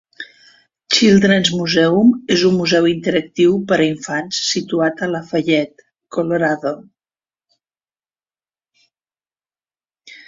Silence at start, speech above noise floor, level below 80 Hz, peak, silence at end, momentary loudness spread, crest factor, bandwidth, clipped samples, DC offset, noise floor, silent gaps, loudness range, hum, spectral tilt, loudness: 0.2 s; over 75 dB; -56 dBFS; -2 dBFS; 0.1 s; 13 LU; 16 dB; 7.6 kHz; under 0.1%; under 0.1%; under -90 dBFS; none; 11 LU; none; -4.5 dB/octave; -16 LUFS